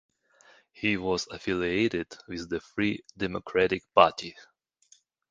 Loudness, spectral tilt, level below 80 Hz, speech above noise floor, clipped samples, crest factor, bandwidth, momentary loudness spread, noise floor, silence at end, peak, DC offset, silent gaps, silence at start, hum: -28 LUFS; -5 dB/octave; -56 dBFS; 35 dB; under 0.1%; 26 dB; 9.6 kHz; 14 LU; -63 dBFS; 0.9 s; -2 dBFS; under 0.1%; none; 0.8 s; none